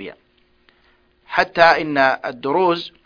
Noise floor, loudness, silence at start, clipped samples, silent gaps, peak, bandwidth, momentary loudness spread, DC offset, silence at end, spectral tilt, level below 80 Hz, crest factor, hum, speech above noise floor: -59 dBFS; -17 LUFS; 0 s; under 0.1%; none; 0 dBFS; 5.2 kHz; 10 LU; under 0.1%; 0.2 s; -5.5 dB/octave; -56 dBFS; 20 dB; none; 42 dB